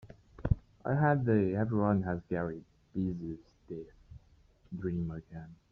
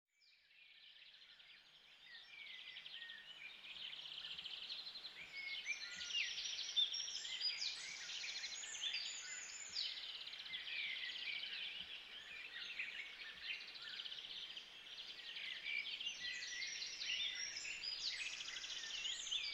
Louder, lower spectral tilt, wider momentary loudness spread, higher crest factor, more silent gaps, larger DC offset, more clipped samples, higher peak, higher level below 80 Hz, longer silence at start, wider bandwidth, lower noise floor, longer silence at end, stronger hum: first, -33 LUFS vs -45 LUFS; first, -9.5 dB/octave vs 2.5 dB/octave; first, 19 LU vs 13 LU; about the same, 22 dB vs 20 dB; neither; neither; neither; first, -12 dBFS vs -28 dBFS; first, -50 dBFS vs -82 dBFS; second, 0.05 s vs 0.2 s; second, 5.6 kHz vs 16 kHz; second, -64 dBFS vs -72 dBFS; first, 0.2 s vs 0 s; neither